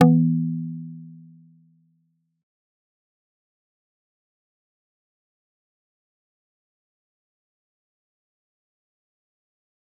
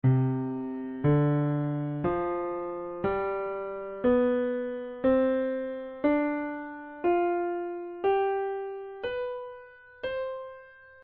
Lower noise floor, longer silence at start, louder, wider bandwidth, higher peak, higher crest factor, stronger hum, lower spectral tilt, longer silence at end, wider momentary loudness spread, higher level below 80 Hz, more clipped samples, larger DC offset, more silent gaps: first, -70 dBFS vs -50 dBFS; about the same, 0 s vs 0.05 s; first, -22 LUFS vs -29 LUFS; second, 3.4 kHz vs 4.5 kHz; first, -2 dBFS vs -14 dBFS; first, 28 dB vs 16 dB; neither; first, -9.5 dB/octave vs -7.5 dB/octave; first, 8.85 s vs 0 s; first, 24 LU vs 12 LU; second, -78 dBFS vs -56 dBFS; neither; neither; neither